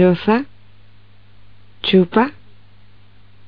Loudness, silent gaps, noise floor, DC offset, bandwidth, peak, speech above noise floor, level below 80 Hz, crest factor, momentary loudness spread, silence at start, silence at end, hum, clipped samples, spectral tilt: -17 LUFS; none; -49 dBFS; 1%; 5.2 kHz; -2 dBFS; 35 dB; -54 dBFS; 18 dB; 10 LU; 0 s; 1.15 s; 50 Hz at -45 dBFS; under 0.1%; -5 dB/octave